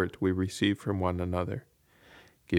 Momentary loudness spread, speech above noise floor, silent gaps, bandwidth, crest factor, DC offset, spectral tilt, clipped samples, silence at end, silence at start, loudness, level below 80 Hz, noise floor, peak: 7 LU; 28 dB; none; 15.5 kHz; 20 dB; under 0.1%; -6.5 dB/octave; under 0.1%; 0 s; 0 s; -31 LUFS; -54 dBFS; -58 dBFS; -10 dBFS